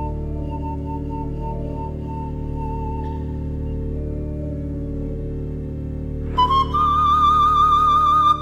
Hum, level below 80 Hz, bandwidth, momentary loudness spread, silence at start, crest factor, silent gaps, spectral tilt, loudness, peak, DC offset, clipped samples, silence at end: none; -30 dBFS; 12.5 kHz; 14 LU; 0 s; 14 dB; none; -7 dB/octave; -21 LUFS; -6 dBFS; under 0.1%; under 0.1%; 0 s